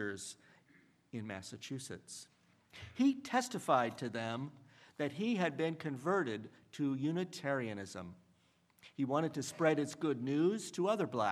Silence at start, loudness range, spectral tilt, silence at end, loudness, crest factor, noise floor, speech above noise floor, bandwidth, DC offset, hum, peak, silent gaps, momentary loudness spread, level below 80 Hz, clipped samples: 0 s; 4 LU; -5.5 dB/octave; 0 s; -37 LUFS; 22 dB; -72 dBFS; 35 dB; 14 kHz; under 0.1%; none; -16 dBFS; none; 16 LU; -82 dBFS; under 0.1%